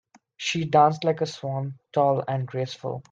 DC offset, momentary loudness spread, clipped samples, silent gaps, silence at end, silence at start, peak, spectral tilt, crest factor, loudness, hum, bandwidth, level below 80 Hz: under 0.1%; 12 LU; under 0.1%; none; 0.1 s; 0.4 s; -6 dBFS; -5.5 dB/octave; 20 dB; -25 LUFS; none; 7.8 kHz; -68 dBFS